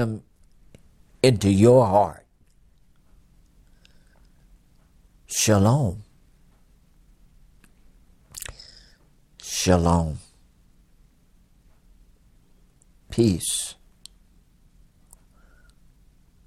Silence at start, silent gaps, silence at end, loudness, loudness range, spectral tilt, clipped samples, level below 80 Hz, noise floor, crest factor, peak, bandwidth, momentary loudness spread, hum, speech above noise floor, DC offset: 0 s; none; 2.75 s; -21 LUFS; 12 LU; -5.5 dB/octave; under 0.1%; -50 dBFS; -59 dBFS; 22 dB; -4 dBFS; 16 kHz; 24 LU; none; 39 dB; under 0.1%